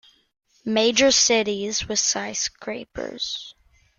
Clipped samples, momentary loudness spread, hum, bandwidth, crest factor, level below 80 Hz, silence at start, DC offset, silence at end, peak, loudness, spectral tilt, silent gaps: under 0.1%; 17 LU; none; 11 kHz; 20 dB; -54 dBFS; 0.65 s; under 0.1%; 0.5 s; -4 dBFS; -21 LUFS; -1.5 dB/octave; none